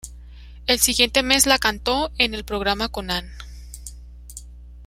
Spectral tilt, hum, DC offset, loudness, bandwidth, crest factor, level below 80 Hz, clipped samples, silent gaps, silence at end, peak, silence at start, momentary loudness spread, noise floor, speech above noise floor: -1.5 dB/octave; 60 Hz at -35 dBFS; under 0.1%; -19 LUFS; 16 kHz; 24 dB; -38 dBFS; under 0.1%; none; 0 s; 0 dBFS; 0.05 s; 24 LU; -40 dBFS; 19 dB